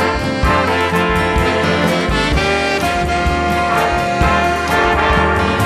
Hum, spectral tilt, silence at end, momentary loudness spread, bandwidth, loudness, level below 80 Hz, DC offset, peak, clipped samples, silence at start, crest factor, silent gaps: none; -5 dB/octave; 0 s; 3 LU; 14 kHz; -14 LUFS; -24 dBFS; under 0.1%; -2 dBFS; under 0.1%; 0 s; 12 dB; none